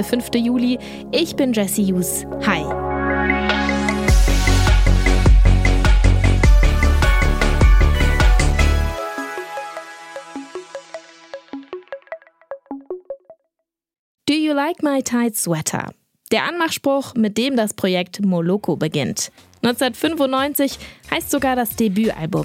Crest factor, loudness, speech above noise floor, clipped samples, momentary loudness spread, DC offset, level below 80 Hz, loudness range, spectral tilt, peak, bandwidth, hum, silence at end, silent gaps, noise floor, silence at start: 16 dB; -18 LUFS; 56 dB; under 0.1%; 18 LU; under 0.1%; -20 dBFS; 17 LU; -5 dB/octave; -2 dBFS; 16 kHz; none; 0 s; 13.99-14.15 s; -76 dBFS; 0 s